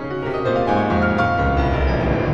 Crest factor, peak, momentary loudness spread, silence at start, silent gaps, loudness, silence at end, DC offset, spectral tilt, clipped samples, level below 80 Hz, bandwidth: 14 dB; -4 dBFS; 3 LU; 0 s; none; -19 LUFS; 0 s; under 0.1%; -8 dB/octave; under 0.1%; -26 dBFS; 7.4 kHz